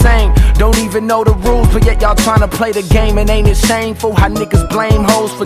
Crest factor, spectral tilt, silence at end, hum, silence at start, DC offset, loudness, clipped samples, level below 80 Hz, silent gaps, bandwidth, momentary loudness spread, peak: 10 dB; -5.5 dB/octave; 0 s; none; 0 s; under 0.1%; -12 LUFS; under 0.1%; -12 dBFS; none; 15.5 kHz; 3 LU; 0 dBFS